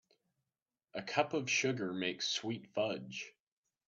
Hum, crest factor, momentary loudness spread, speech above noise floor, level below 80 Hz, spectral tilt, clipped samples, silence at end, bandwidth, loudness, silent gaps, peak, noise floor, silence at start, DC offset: none; 24 dB; 13 LU; over 53 dB; -82 dBFS; -3.5 dB/octave; under 0.1%; 0.55 s; 8.2 kHz; -36 LUFS; none; -16 dBFS; under -90 dBFS; 0.95 s; under 0.1%